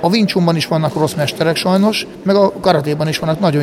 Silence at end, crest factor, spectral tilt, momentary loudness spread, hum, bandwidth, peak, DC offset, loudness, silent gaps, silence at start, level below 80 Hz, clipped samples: 0 s; 14 dB; -6 dB/octave; 4 LU; none; 16 kHz; 0 dBFS; under 0.1%; -15 LUFS; none; 0 s; -48 dBFS; under 0.1%